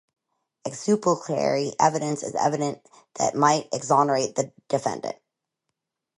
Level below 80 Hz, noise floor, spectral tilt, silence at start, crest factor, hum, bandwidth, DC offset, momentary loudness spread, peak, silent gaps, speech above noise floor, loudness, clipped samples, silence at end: -70 dBFS; -82 dBFS; -4.5 dB/octave; 0.65 s; 20 dB; none; 11.5 kHz; under 0.1%; 15 LU; -4 dBFS; none; 58 dB; -24 LUFS; under 0.1%; 1.05 s